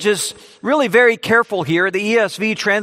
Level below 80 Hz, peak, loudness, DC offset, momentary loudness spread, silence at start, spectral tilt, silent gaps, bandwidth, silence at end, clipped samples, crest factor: -62 dBFS; 0 dBFS; -16 LUFS; under 0.1%; 7 LU; 0 s; -3.5 dB/octave; none; 16 kHz; 0 s; under 0.1%; 16 dB